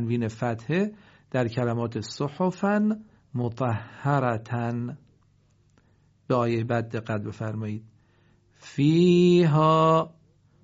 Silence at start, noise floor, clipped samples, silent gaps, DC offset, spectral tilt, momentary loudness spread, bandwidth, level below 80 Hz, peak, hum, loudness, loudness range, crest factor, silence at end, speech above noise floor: 0 s; -62 dBFS; under 0.1%; none; under 0.1%; -6.5 dB/octave; 14 LU; 7.6 kHz; -64 dBFS; -8 dBFS; none; -25 LUFS; 8 LU; 18 dB; 0.55 s; 38 dB